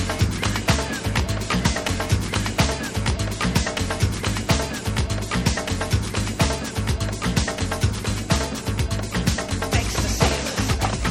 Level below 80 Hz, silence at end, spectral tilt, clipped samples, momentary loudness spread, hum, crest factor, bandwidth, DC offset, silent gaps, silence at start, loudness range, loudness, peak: -30 dBFS; 0 s; -4.5 dB/octave; under 0.1%; 4 LU; none; 20 dB; 17 kHz; under 0.1%; none; 0 s; 1 LU; -23 LUFS; -2 dBFS